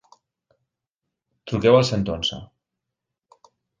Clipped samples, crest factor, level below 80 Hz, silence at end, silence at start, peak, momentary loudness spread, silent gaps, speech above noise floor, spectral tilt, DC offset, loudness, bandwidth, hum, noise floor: under 0.1%; 22 dB; -50 dBFS; 1.35 s; 1.45 s; -2 dBFS; 21 LU; none; 64 dB; -5.5 dB/octave; under 0.1%; -20 LUFS; 9.6 kHz; none; -84 dBFS